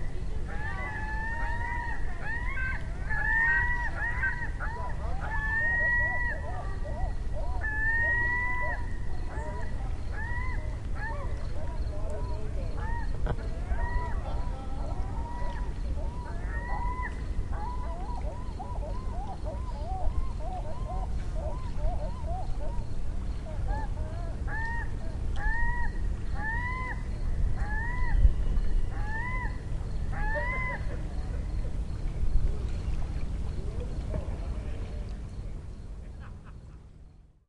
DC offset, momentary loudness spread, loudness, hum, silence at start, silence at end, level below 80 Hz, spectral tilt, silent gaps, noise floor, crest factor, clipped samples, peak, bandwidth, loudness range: under 0.1%; 10 LU; -33 LUFS; none; 0 s; 0.25 s; -32 dBFS; -6.5 dB/octave; none; -52 dBFS; 20 dB; under 0.1%; -10 dBFS; 10.5 kHz; 7 LU